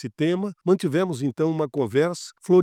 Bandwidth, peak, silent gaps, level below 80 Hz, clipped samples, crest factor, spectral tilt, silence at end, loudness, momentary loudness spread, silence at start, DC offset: 13.5 kHz; -8 dBFS; none; -70 dBFS; under 0.1%; 14 dB; -7 dB/octave; 0 s; -24 LUFS; 5 LU; 0 s; under 0.1%